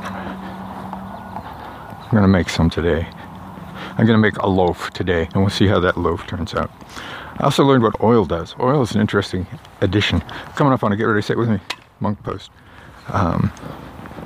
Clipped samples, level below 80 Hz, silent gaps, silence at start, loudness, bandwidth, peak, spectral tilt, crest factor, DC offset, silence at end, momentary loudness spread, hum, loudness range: under 0.1%; -40 dBFS; none; 0 s; -18 LUFS; 15.5 kHz; 0 dBFS; -6.5 dB/octave; 18 dB; under 0.1%; 0 s; 18 LU; none; 3 LU